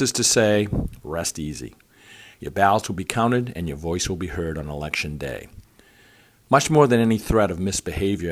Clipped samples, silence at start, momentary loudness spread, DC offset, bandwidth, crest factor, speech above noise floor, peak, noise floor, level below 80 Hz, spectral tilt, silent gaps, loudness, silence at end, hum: under 0.1%; 0 s; 14 LU; under 0.1%; 15.5 kHz; 22 dB; 32 dB; -2 dBFS; -54 dBFS; -40 dBFS; -4.5 dB/octave; none; -22 LUFS; 0 s; none